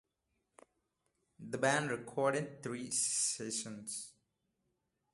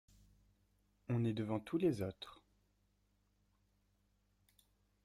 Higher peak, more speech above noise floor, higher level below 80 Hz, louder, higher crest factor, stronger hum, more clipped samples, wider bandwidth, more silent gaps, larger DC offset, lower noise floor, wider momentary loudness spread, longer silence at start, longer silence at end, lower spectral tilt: first, -16 dBFS vs -24 dBFS; first, 47 dB vs 40 dB; second, -80 dBFS vs -74 dBFS; first, -36 LUFS vs -39 LUFS; about the same, 22 dB vs 20 dB; second, none vs 50 Hz at -70 dBFS; neither; second, 12 kHz vs 14 kHz; neither; neither; first, -84 dBFS vs -78 dBFS; second, 12 LU vs 17 LU; first, 1.4 s vs 1.1 s; second, 1.05 s vs 2.7 s; second, -2.5 dB/octave vs -8 dB/octave